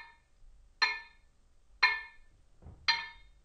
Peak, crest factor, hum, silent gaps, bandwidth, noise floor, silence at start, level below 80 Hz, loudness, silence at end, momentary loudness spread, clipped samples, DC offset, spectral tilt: -10 dBFS; 28 dB; none; none; 9.4 kHz; -63 dBFS; 0 s; -60 dBFS; -31 LUFS; 0.35 s; 15 LU; under 0.1%; under 0.1%; 0 dB/octave